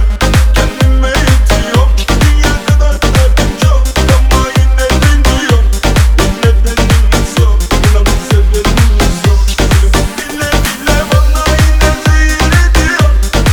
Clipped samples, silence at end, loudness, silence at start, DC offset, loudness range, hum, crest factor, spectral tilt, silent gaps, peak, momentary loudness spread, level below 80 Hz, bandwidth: 0.3%; 0 s; -10 LUFS; 0 s; under 0.1%; 1 LU; none; 8 dB; -5 dB/octave; none; 0 dBFS; 2 LU; -10 dBFS; 19.5 kHz